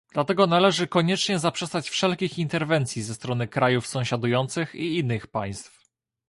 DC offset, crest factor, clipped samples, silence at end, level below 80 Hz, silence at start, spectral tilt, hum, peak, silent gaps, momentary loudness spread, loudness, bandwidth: under 0.1%; 20 dB; under 0.1%; 0.6 s; -60 dBFS; 0.15 s; -5 dB/octave; none; -6 dBFS; none; 9 LU; -24 LUFS; 11.5 kHz